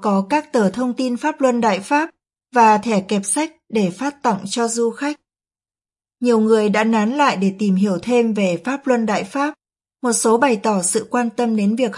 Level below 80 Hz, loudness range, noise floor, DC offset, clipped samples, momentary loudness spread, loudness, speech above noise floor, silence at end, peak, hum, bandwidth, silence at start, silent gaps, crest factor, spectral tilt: -66 dBFS; 3 LU; under -90 dBFS; under 0.1%; under 0.1%; 7 LU; -18 LUFS; over 73 dB; 0 s; -2 dBFS; none; 11.5 kHz; 0 s; none; 16 dB; -4.5 dB/octave